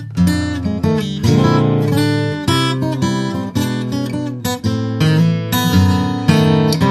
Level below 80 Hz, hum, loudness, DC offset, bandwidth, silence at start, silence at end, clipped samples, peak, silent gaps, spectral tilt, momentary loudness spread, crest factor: -40 dBFS; none; -16 LUFS; under 0.1%; 14 kHz; 0 s; 0 s; under 0.1%; 0 dBFS; none; -6 dB/octave; 7 LU; 14 dB